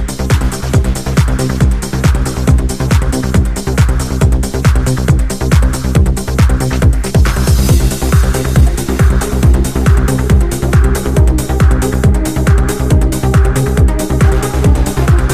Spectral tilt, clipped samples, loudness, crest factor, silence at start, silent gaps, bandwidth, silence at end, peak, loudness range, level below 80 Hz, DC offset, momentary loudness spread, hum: -6 dB/octave; under 0.1%; -12 LUFS; 10 dB; 0 s; none; 15.5 kHz; 0 s; 0 dBFS; 1 LU; -14 dBFS; under 0.1%; 2 LU; none